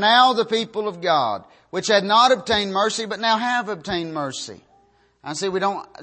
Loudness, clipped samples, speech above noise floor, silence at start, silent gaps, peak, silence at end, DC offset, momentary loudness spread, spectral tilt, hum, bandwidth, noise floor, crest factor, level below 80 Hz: -20 LUFS; under 0.1%; 38 dB; 0 s; none; -2 dBFS; 0 s; under 0.1%; 15 LU; -3 dB/octave; none; 8.8 kHz; -58 dBFS; 18 dB; -56 dBFS